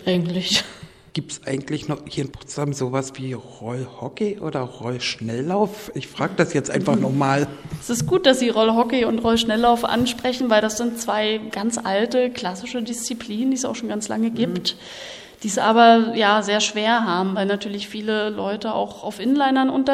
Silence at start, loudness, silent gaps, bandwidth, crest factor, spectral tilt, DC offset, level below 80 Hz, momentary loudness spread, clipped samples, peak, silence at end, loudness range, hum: 0 s; -21 LUFS; none; 15.5 kHz; 20 dB; -4.5 dB/octave; under 0.1%; -54 dBFS; 13 LU; under 0.1%; -2 dBFS; 0 s; 8 LU; none